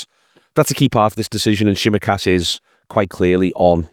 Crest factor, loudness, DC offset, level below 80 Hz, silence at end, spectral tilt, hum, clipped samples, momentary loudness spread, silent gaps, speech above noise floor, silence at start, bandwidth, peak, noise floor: 16 dB; -17 LUFS; under 0.1%; -46 dBFS; 0.05 s; -5 dB/octave; none; under 0.1%; 7 LU; none; 42 dB; 0 s; 20 kHz; 0 dBFS; -57 dBFS